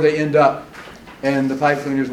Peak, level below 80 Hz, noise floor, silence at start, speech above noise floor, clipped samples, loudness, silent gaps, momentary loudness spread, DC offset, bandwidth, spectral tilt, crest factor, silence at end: -2 dBFS; -54 dBFS; -38 dBFS; 0 s; 21 dB; under 0.1%; -18 LUFS; none; 22 LU; under 0.1%; 13.5 kHz; -6.5 dB/octave; 16 dB; 0 s